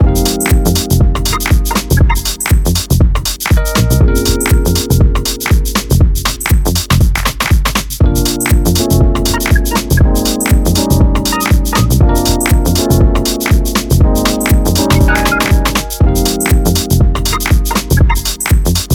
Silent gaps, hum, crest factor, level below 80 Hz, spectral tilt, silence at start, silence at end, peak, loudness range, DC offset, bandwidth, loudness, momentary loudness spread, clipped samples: none; none; 10 dB; -14 dBFS; -4.5 dB/octave; 0 s; 0 s; 0 dBFS; 1 LU; under 0.1%; 19.5 kHz; -12 LUFS; 3 LU; under 0.1%